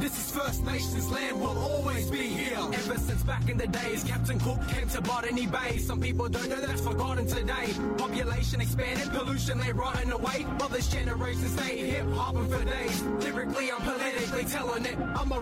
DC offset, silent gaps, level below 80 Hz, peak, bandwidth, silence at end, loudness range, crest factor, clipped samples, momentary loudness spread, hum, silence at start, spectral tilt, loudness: under 0.1%; none; -38 dBFS; -18 dBFS; 16 kHz; 0 s; 0 LU; 12 dB; under 0.1%; 1 LU; none; 0 s; -5 dB/octave; -30 LUFS